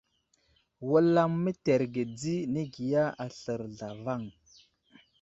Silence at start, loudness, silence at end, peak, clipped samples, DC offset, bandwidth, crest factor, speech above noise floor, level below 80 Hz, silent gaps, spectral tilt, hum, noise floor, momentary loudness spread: 0.8 s; -30 LUFS; 0.9 s; -12 dBFS; under 0.1%; under 0.1%; 8 kHz; 18 dB; 43 dB; -68 dBFS; none; -7 dB/octave; none; -72 dBFS; 14 LU